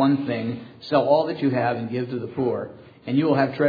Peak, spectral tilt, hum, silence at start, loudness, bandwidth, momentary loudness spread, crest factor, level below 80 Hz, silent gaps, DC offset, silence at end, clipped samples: -6 dBFS; -9 dB/octave; none; 0 s; -23 LUFS; 5 kHz; 11 LU; 16 dB; -68 dBFS; none; under 0.1%; 0 s; under 0.1%